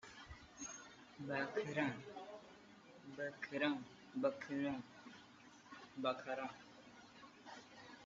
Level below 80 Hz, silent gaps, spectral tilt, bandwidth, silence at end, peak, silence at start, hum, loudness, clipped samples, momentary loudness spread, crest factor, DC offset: -76 dBFS; none; -3.5 dB/octave; 7.6 kHz; 0 s; -26 dBFS; 0.05 s; none; -44 LUFS; under 0.1%; 19 LU; 20 dB; under 0.1%